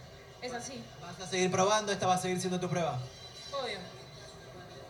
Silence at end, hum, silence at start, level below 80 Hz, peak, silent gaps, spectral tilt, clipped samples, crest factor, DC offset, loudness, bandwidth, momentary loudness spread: 0 s; none; 0 s; -64 dBFS; -16 dBFS; none; -4 dB/octave; under 0.1%; 18 dB; under 0.1%; -33 LUFS; 19 kHz; 20 LU